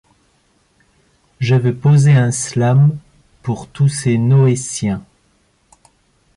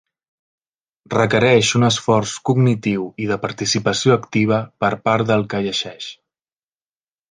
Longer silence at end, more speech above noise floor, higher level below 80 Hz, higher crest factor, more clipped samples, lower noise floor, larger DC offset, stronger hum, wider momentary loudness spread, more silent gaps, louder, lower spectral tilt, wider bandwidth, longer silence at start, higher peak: first, 1.35 s vs 1.15 s; second, 45 dB vs over 72 dB; about the same, -50 dBFS vs -54 dBFS; second, 12 dB vs 18 dB; neither; second, -58 dBFS vs under -90 dBFS; neither; neither; first, 13 LU vs 9 LU; neither; first, -15 LUFS vs -18 LUFS; first, -6.5 dB/octave vs -5 dB/octave; first, 11.5 kHz vs 10 kHz; first, 1.4 s vs 1.1 s; about the same, -4 dBFS vs -2 dBFS